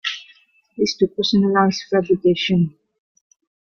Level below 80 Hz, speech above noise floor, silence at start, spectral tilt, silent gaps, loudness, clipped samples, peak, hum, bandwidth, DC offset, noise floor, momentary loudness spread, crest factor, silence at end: -56 dBFS; 36 dB; 0.05 s; -5.5 dB/octave; none; -19 LUFS; under 0.1%; -2 dBFS; none; 7.2 kHz; under 0.1%; -54 dBFS; 10 LU; 18 dB; 1 s